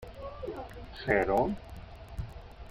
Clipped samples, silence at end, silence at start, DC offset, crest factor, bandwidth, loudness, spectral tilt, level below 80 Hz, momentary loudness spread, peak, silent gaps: under 0.1%; 0 s; 0 s; under 0.1%; 22 dB; 16.5 kHz; -32 LUFS; -7 dB/octave; -48 dBFS; 20 LU; -12 dBFS; none